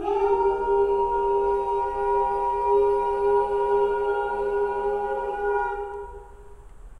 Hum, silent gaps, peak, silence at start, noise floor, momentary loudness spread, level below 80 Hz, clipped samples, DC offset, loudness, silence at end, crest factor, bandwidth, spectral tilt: none; none; -12 dBFS; 0 s; -44 dBFS; 5 LU; -46 dBFS; under 0.1%; under 0.1%; -24 LUFS; 0 s; 12 dB; 5 kHz; -6.5 dB/octave